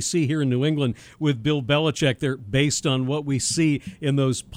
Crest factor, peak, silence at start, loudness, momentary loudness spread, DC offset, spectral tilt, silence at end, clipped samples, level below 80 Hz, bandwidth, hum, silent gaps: 16 dB; -6 dBFS; 0 s; -23 LUFS; 5 LU; under 0.1%; -5 dB/octave; 0 s; under 0.1%; -52 dBFS; 14.5 kHz; none; none